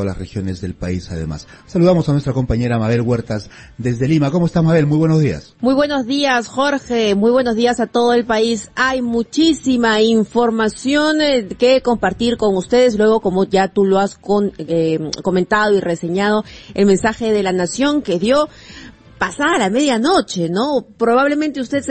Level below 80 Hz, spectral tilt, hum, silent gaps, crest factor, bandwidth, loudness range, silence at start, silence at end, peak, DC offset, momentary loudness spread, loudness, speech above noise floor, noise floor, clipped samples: -40 dBFS; -5.5 dB/octave; none; none; 14 dB; 8.8 kHz; 2 LU; 0 s; 0 s; -2 dBFS; under 0.1%; 9 LU; -16 LUFS; 23 dB; -38 dBFS; under 0.1%